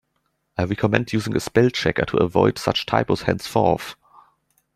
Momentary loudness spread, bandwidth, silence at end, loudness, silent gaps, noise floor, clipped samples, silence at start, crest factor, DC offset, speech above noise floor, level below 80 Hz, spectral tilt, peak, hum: 7 LU; 15.5 kHz; 0.85 s; -21 LUFS; none; -71 dBFS; under 0.1%; 0.6 s; 20 dB; under 0.1%; 51 dB; -50 dBFS; -6 dB/octave; -2 dBFS; none